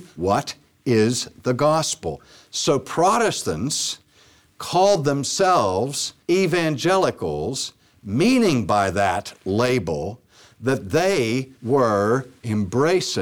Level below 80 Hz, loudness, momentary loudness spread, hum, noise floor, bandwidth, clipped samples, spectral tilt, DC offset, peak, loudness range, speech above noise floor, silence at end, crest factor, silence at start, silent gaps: -52 dBFS; -21 LUFS; 10 LU; none; -55 dBFS; 18.5 kHz; under 0.1%; -4.5 dB/octave; under 0.1%; -8 dBFS; 2 LU; 34 dB; 0 s; 14 dB; 0 s; none